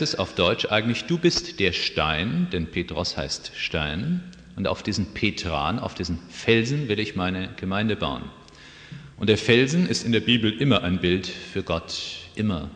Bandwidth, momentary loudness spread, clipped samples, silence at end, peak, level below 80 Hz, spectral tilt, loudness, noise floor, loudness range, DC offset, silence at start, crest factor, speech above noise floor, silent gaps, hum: 9.8 kHz; 10 LU; under 0.1%; 0 s; -4 dBFS; -46 dBFS; -5 dB/octave; -24 LUFS; -46 dBFS; 5 LU; under 0.1%; 0 s; 20 dB; 22 dB; none; none